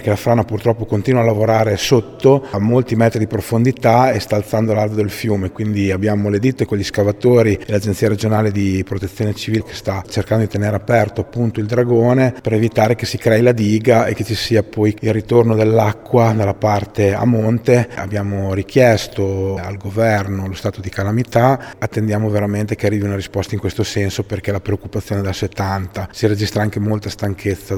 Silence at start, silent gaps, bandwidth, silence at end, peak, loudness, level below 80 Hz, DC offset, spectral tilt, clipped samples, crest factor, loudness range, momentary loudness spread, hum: 0 s; none; 16.5 kHz; 0 s; 0 dBFS; -16 LUFS; -44 dBFS; under 0.1%; -6.5 dB/octave; under 0.1%; 16 dB; 5 LU; 8 LU; none